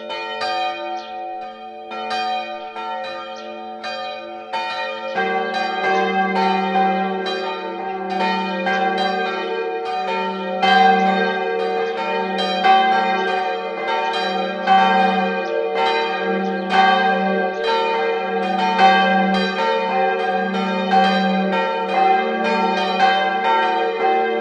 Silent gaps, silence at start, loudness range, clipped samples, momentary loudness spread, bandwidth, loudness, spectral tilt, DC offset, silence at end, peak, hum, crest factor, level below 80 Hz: none; 0 s; 9 LU; under 0.1%; 13 LU; 8.6 kHz; -19 LUFS; -5.5 dB/octave; under 0.1%; 0 s; -2 dBFS; none; 18 dB; -68 dBFS